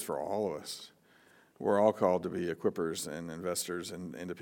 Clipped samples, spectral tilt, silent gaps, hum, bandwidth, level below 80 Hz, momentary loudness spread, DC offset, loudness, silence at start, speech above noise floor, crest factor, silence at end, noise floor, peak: under 0.1%; -4.5 dB/octave; none; none; 18 kHz; -76 dBFS; 14 LU; under 0.1%; -33 LUFS; 0 s; 30 dB; 20 dB; 0 s; -63 dBFS; -14 dBFS